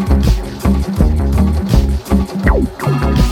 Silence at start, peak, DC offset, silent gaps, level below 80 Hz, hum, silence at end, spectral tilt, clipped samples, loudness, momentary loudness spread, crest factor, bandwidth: 0 s; 0 dBFS; under 0.1%; none; -16 dBFS; none; 0 s; -7 dB/octave; under 0.1%; -15 LUFS; 3 LU; 12 dB; 16 kHz